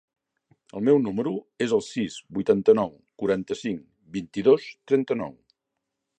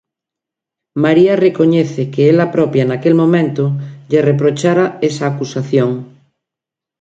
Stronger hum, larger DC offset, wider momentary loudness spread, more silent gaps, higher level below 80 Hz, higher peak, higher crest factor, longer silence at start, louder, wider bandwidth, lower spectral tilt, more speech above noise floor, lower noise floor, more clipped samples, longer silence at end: neither; neither; first, 12 LU vs 8 LU; neither; second, -64 dBFS vs -58 dBFS; second, -6 dBFS vs 0 dBFS; first, 20 dB vs 14 dB; second, 0.75 s vs 0.95 s; second, -25 LUFS vs -13 LUFS; about the same, 9.2 kHz vs 8.8 kHz; about the same, -6.5 dB/octave vs -7.5 dB/octave; second, 59 dB vs 73 dB; about the same, -82 dBFS vs -85 dBFS; neither; about the same, 0.85 s vs 0.95 s